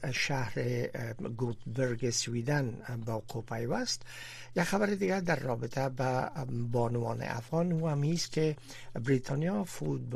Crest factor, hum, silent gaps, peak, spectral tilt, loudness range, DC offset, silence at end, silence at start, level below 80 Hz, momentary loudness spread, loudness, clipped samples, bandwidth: 16 dB; none; none; -16 dBFS; -5.5 dB/octave; 2 LU; under 0.1%; 0 s; 0 s; -58 dBFS; 7 LU; -33 LUFS; under 0.1%; 14.5 kHz